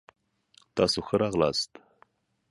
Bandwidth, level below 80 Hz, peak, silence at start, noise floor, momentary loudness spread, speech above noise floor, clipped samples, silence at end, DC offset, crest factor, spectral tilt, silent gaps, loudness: 11.5 kHz; -56 dBFS; -8 dBFS; 0.75 s; -65 dBFS; 10 LU; 38 dB; under 0.1%; 0.85 s; under 0.1%; 22 dB; -4.5 dB/octave; none; -27 LUFS